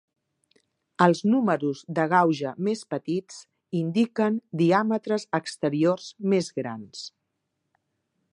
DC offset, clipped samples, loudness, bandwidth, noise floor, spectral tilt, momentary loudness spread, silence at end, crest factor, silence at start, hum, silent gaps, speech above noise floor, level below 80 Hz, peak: under 0.1%; under 0.1%; -25 LUFS; 11 kHz; -79 dBFS; -6.5 dB/octave; 15 LU; 1.25 s; 22 dB; 1 s; none; none; 55 dB; -74 dBFS; -4 dBFS